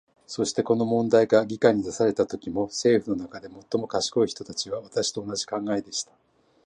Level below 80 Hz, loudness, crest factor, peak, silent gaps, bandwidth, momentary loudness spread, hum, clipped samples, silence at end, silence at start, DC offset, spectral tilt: -62 dBFS; -25 LUFS; 20 dB; -4 dBFS; none; 11 kHz; 11 LU; none; under 0.1%; 0.65 s; 0.3 s; under 0.1%; -4.5 dB/octave